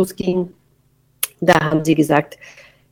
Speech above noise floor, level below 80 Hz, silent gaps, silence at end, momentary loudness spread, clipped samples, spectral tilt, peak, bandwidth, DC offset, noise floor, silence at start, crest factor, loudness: 41 dB; -52 dBFS; none; 0.4 s; 11 LU; under 0.1%; -5.5 dB/octave; 0 dBFS; 18.5 kHz; under 0.1%; -59 dBFS; 0 s; 20 dB; -17 LUFS